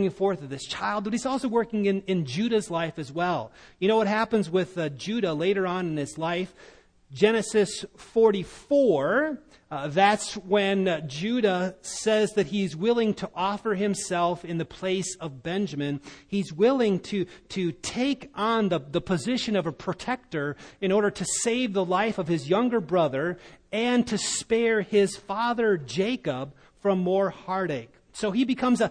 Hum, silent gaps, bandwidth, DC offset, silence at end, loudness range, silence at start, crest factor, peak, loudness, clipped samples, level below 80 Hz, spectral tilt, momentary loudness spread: none; none; 10.5 kHz; under 0.1%; 0 s; 3 LU; 0 s; 20 dB; -6 dBFS; -26 LUFS; under 0.1%; -60 dBFS; -5 dB/octave; 9 LU